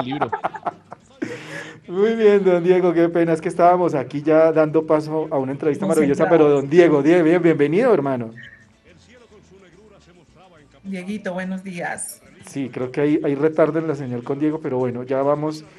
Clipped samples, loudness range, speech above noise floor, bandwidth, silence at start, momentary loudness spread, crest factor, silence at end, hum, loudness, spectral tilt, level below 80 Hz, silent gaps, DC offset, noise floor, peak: under 0.1%; 15 LU; 33 dB; 12.5 kHz; 0 s; 16 LU; 20 dB; 0.15 s; none; -19 LUFS; -7 dB/octave; -62 dBFS; none; under 0.1%; -51 dBFS; 0 dBFS